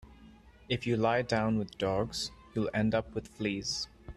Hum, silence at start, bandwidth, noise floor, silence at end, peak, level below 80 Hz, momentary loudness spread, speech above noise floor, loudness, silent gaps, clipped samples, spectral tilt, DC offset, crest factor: none; 0.05 s; 12.5 kHz; -56 dBFS; 0.05 s; -14 dBFS; -54 dBFS; 8 LU; 24 dB; -32 LUFS; none; under 0.1%; -5 dB/octave; under 0.1%; 18 dB